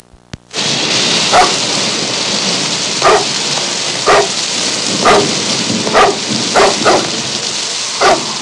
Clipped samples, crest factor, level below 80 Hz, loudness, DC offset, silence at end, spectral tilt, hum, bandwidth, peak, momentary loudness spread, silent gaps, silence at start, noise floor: under 0.1%; 12 dB; -46 dBFS; -11 LUFS; under 0.1%; 0 s; -1.5 dB/octave; none; 11.5 kHz; 0 dBFS; 6 LU; none; 0.55 s; -34 dBFS